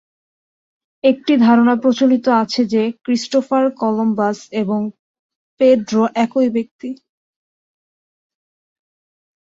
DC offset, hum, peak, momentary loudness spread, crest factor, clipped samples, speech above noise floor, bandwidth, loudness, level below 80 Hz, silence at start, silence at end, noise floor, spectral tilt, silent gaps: under 0.1%; none; -2 dBFS; 10 LU; 16 dB; under 0.1%; over 75 dB; 7.8 kHz; -16 LUFS; -64 dBFS; 1.05 s; 2.6 s; under -90 dBFS; -6 dB/octave; 4.99-5.29 s, 5.35-5.57 s, 6.71-6.79 s